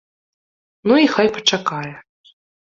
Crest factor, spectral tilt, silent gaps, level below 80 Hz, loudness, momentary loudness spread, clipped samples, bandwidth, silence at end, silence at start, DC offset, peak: 18 dB; -4 dB/octave; none; -62 dBFS; -17 LUFS; 14 LU; under 0.1%; 7.4 kHz; 0.7 s; 0.85 s; under 0.1%; -2 dBFS